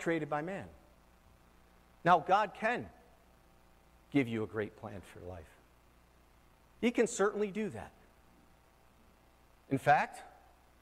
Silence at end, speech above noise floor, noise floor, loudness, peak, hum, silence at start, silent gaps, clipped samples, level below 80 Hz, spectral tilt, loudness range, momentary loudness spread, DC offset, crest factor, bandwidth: 0.55 s; 31 dB; -64 dBFS; -33 LUFS; -12 dBFS; 60 Hz at -65 dBFS; 0 s; none; under 0.1%; -66 dBFS; -5.5 dB/octave; 7 LU; 20 LU; under 0.1%; 24 dB; 15.5 kHz